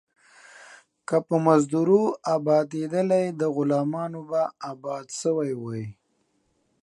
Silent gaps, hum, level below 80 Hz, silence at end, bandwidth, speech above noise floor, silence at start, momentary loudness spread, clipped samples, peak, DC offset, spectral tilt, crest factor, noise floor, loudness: none; none; -72 dBFS; 0.9 s; 11.5 kHz; 47 dB; 0.55 s; 13 LU; under 0.1%; -4 dBFS; under 0.1%; -7 dB/octave; 20 dB; -70 dBFS; -24 LUFS